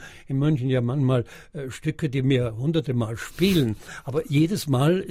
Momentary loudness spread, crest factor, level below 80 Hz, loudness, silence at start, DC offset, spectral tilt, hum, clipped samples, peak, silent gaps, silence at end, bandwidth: 9 LU; 16 dB; -48 dBFS; -24 LUFS; 0 s; under 0.1%; -7 dB/octave; none; under 0.1%; -8 dBFS; none; 0 s; 16 kHz